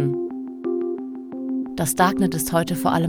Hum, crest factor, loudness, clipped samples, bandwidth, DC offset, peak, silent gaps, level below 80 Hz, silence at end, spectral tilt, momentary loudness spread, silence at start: none; 20 dB; -23 LUFS; under 0.1%; over 20 kHz; under 0.1%; -4 dBFS; none; -52 dBFS; 0 s; -5 dB/octave; 12 LU; 0 s